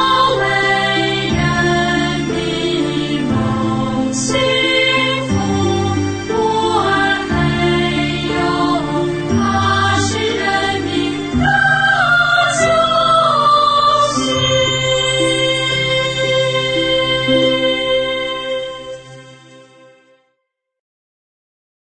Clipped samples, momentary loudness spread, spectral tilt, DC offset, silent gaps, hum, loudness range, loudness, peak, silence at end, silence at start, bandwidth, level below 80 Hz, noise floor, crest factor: under 0.1%; 7 LU; -4 dB/octave; under 0.1%; none; none; 5 LU; -14 LUFS; -2 dBFS; 2.35 s; 0 s; 9.2 kHz; -38 dBFS; -72 dBFS; 12 dB